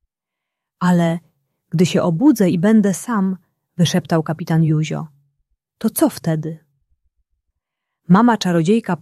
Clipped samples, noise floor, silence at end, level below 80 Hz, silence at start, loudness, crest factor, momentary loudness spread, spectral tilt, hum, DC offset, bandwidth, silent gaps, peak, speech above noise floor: under 0.1%; -83 dBFS; 0.05 s; -60 dBFS; 0.8 s; -17 LUFS; 16 dB; 13 LU; -6.5 dB/octave; none; under 0.1%; 14.5 kHz; none; -2 dBFS; 67 dB